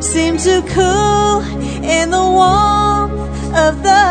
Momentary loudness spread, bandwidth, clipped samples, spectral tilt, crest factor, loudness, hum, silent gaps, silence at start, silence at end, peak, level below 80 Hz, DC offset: 8 LU; 9.4 kHz; under 0.1%; -4 dB/octave; 12 dB; -13 LUFS; none; none; 0 s; 0 s; 0 dBFS; -26 dBFS; under 0.1%